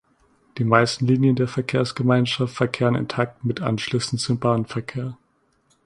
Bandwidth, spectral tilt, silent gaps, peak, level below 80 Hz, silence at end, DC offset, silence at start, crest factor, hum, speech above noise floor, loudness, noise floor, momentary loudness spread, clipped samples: 11.5 kHz; -6 dB/octave; none; 0 dBFS; -56 dBFS; 0.7 s; under 0.1%; 0.55 s; 22 dB; none; 43 dB; -22 LUFS; -64 dBFS; 10 LU; under 0.1%